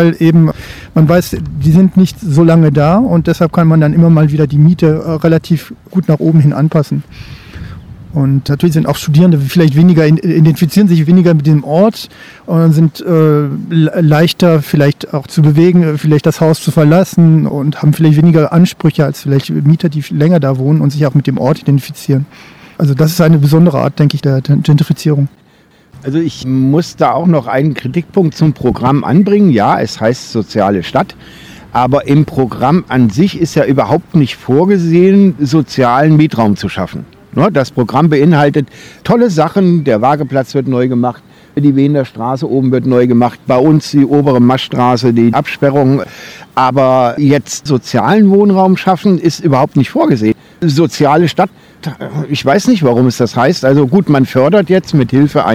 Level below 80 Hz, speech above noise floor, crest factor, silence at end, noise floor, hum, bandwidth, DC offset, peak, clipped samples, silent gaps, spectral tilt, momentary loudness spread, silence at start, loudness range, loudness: -42 dBFS; 37 dB; 10 dB; 0 s; -46 dBFS; none; 14.5 kHz; under 0.1%; 0 dBFS; 2%; none; -7.5 dB/octave; 8 LU; 0 s; 4 LU; -10 LUFS